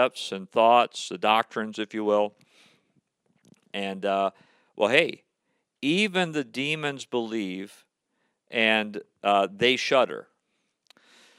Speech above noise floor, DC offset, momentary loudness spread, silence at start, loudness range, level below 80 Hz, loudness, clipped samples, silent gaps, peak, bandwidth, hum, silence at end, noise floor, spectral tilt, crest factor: 52 dB; under 0.1%; 11 LU; 0 s; 3 LU; -78 dBFS; -25 LUFS; under 0.1%; none; -2 dBFS; 13.5 kHz; none; 1.15 s; -77 dBFS; -4 dB/octave; 24 dB